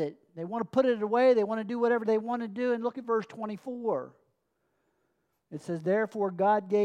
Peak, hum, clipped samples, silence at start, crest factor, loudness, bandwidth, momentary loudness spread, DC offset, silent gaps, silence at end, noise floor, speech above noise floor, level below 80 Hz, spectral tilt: -14 dBFS; none; under 0.1%; 0 s; 16 dB; -29 LUFS; 9.6 kHz; 13 LU; under 0.1%; none; 0 s; -77 dBFS; 49 dB; -84 dBFS; -7 dB/octave